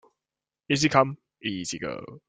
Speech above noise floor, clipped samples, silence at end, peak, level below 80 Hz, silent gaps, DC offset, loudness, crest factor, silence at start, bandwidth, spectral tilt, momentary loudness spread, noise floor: over 64 dB; under 0.1%; 0.1 s; -4 dBFS; -62 dBFS; none; under 0.1%; -26 LUFS; 24 dB; 0.7 s; 9.6 kHz; -4.5 dB/octave; 13 LU; under -90 dBFS